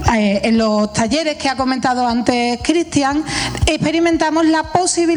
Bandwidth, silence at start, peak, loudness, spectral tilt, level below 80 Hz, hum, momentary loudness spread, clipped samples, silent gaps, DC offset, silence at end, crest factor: 10.5 kHz; 0 s; 0 dBFS; -16 LUFS; -4.5 dB/octave; -34 dBFS; none; 3 LU; under 0.1%; none; under 0.1%; 0 s; 16 dB